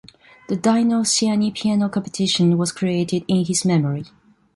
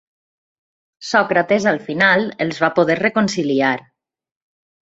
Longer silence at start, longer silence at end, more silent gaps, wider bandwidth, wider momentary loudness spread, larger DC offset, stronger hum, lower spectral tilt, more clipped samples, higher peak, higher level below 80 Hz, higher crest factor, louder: second, 0.5 s vs 1 s; second, 0.5 s vs 1.05 s; neither; first, 11.5 kHz vs 8 kHz; about the same, 5 LU vs 5 LU; neither; neither; about the same, -5 dB/octave vs -5 dB/octave; neither; about the same, -4 dBFS vs -2 dBFS; about the same, -60 dBFS vs -60 dBFS; about the same, 14 dB vs 18 dB; about the same, -19 LUFS vs -17 LUFS